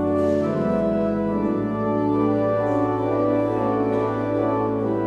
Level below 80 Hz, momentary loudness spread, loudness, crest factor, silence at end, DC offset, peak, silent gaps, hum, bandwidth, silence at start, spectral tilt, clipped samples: -48 dBFS; 2 LU; -22 LUFS; 12 dB; 0 s; under 0.1%; -10 dBFS; none; none; 7.8 kHz; 0 s; -9.5 dB/octave; under 0.1%